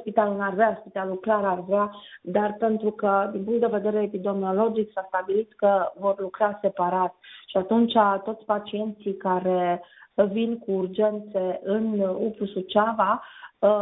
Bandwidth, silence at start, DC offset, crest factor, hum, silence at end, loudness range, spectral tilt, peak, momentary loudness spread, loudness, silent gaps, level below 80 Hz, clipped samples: 4 kHz; 0 s; under 0.1%; 18 dB; none; 0 s; 2 LU; -10.5 dB/octave; -6 dBFS; 7 LU; -25 LUFS; none; -66 dBFS; under 0.1%